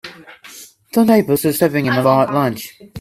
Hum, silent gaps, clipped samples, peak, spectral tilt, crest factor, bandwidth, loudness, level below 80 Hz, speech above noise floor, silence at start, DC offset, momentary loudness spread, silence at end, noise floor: none; none; under 0.1%; 0 dBFS; -6 dB/octave; 16 dB; 16 kHz; -15 LUFS; -56 dBFS; 25 dB; 0.05 s; under 0.1%; 22 LU; 0 s; -40 dBFS